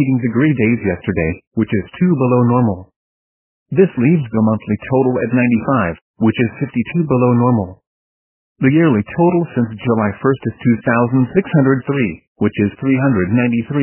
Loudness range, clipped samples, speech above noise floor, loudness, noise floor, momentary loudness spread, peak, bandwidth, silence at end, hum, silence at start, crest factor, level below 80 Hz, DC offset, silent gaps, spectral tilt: 1 LU; under 0.1%; over 75 dB; -16 LUFS; under -90 dBFS; 7 LU; 0 dBFS; 3.2 kHz; 0 s; none; 0 s; 16 dB; -42 dBFS; under 0.1%; 1.47-1.51 s, 2.96-3.66 s, 6.01-6.14 s, 7.87-8.55 s, 12.27-12.35 s; -12.5 dB/octave